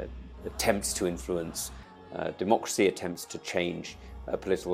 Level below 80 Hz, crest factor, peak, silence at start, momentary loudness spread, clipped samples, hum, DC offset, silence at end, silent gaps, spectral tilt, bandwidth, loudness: -48 dBFS; 22 dB; -10 dBFS; 0 s; 15 LU; under 0.1%; none; under 0.1%; 0 s; none; -4 dB/octave; 16 kHz; -31 LUFS